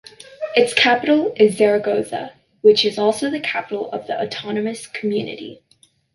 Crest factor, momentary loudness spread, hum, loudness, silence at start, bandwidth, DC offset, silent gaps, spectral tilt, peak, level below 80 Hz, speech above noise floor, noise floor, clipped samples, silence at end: 18 dB; 15 LU; none; -18 LUFS; 0.3 s; 11.5 kHz; under 0.1%; none; -4 dB/octave; -2 dBFS; -64 dBFS; 39 dB; -57 dBFS; under 0.1%; 0.6 s